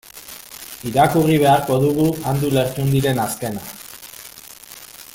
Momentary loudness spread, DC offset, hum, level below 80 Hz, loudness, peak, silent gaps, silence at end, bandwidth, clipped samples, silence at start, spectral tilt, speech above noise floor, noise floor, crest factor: 21 LU; under 0.1%; none; -48 dBFS; -18 LUFS; -2 dBFS; none; 0.1 s; 17 kHz; under 0.1%; 0.15 s; -6 dB/octave; 23 dB; -40 dBFS; 18 dB